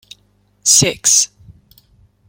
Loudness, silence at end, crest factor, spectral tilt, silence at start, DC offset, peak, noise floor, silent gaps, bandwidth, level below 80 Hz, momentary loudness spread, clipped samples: -12 LUFS; 1.05 s; 18 dB; -1 dB/octave; 0.65 s; under 0.1%; 0 dBFS; -57 dBFS; none; over 20 kHz; -50 dBFS; 9 LU; under 0.1%